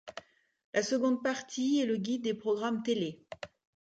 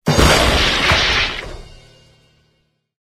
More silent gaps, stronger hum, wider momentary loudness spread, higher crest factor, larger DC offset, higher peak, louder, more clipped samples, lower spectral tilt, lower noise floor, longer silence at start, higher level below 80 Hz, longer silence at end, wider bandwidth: first, 0.64-0.73 s vs none; neither; first, 17 LU vs 13 LU; about the same, 18 dB vs 18 dB; neither; second, -16 dBFS vs 0 dBFS; second, -32 LUFS vs -13 LUFS; neither; about the same, -4.5 dB/octave vs -3.5 dB/octave; second, -52 dBFS vs -64 dBFS; about the same, 0.05 s vs 0.05 s; second, -76 dBFS vs -26 dBFS; second, 0.35 s vs 1.35 s; second, 9 kHz vs 14.5 kHz